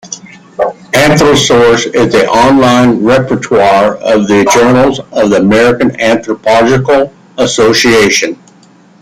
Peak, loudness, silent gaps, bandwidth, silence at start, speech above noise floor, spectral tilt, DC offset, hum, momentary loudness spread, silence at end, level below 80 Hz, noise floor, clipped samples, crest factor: 0 dBFS; -8 LUFS; none; 16 kHz; 0.05 s; 34 dB; -4.5 dB/octave; under 0.1%; none; 9 LU; 0.7 s; -38 dBFS; -41 dBFS; under 0.1%; 8 dB